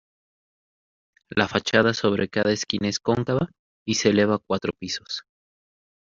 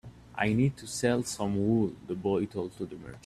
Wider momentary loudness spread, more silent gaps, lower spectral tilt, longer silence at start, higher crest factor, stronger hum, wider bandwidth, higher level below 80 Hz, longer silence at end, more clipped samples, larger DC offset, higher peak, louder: about the same, 11 LU vs 11 LU; first, 3.59-3.86 s vs none; second, -4 dB/octave vs -6 dB/octave; first, 1.3 s vs 0.05 s; about the same, 22 dB vs 18 dB; neither; second, 7.6 kHz vs 14.5 kHz; about the same, -58 dBFS vs -58 dBFS; first, 0.8 s vs 0.05 s; neither; neither; first, -4 dBFS vs -12 dBFS; first, -24 LUFS vs -30 LUFS